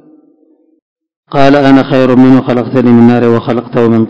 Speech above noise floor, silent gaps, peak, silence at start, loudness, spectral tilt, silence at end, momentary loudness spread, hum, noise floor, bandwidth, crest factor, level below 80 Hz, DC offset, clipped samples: 43 dB; 0.82-0.96 s, 1.16-1.23 s; 0 dBFS; 0 s; -7 LUFS; -8.5 dB/octave; 0 s; 6 LU; none; -49 dBFS; 8 kHz; 8 dB; -44 dBFS; under 0.1%; 7%